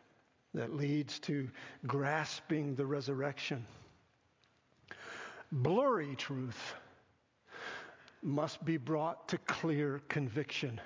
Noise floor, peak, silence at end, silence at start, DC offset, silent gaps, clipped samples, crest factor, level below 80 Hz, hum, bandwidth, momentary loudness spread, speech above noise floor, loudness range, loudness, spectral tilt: -72 dBFS; -18 dBFS; 0 s; 0.55 s; under 0.1%; none; under 0.1%; 20 dB; -74 dBFS; none; 7.6 kHz; 14 LU; 36 dB; 3 LU; -38 LUFS; -6 dB/octave